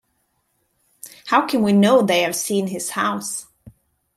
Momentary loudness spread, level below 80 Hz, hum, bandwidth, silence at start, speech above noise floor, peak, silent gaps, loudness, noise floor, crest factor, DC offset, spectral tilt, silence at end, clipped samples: 18 LU; -64 dBFS; none; 15 kHz; 1.05 s; 51 dB; -2 dBFS; none; -19 LUFS; -69 dBFS; 18 dB; under 0.1%; -4.5 dB/octave; 0.75 s; under 0.1%